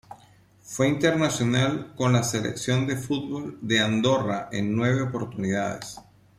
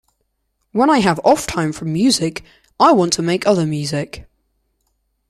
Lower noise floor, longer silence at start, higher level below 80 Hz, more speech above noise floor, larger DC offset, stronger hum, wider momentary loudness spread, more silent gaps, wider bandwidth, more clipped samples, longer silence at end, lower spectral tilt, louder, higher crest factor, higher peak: second, -55 dBFS vs -70 dBFS; second, 0.1 s vs 0.75 s; second, -58 dBFS vs -48 dBFS; second, 31 dB vs 54 dB; neither; neither; about the same, 10 LU vs 12 LU; neither; about the same, 15 kHz vs 15 kHz; neither; second, 0.35 s vs 1.05 s; about the same, -5 dB/octave vs -5 dB/octave; second, -25 LUFS vs -16 LUFS; about the same, 18 dB vs 16 dB; second, -6 dBFS vs -2 dBFS